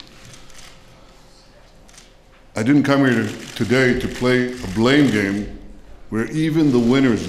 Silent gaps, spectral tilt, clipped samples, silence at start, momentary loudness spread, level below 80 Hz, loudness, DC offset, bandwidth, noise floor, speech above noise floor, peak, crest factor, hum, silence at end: none; -6 dB/octave; under 0.1%; 0.25 s; 12 LU; -42 dBFS; -18 LUFS; under 0.1%; 14 kHz; -47 dBFS; 30 dB; -4 dBFS; 16 dB; none; 0 s